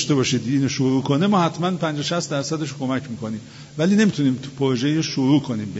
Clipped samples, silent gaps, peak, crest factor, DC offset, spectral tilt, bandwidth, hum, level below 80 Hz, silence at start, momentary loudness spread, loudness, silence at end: under 0.1%; none; -6 dBFS; 16 dB; under 0.1%; -5.5 dB/octave; 8 kHz; none; -58 dBFS; 0 s; 9 LU; -21 LUFS; 0 s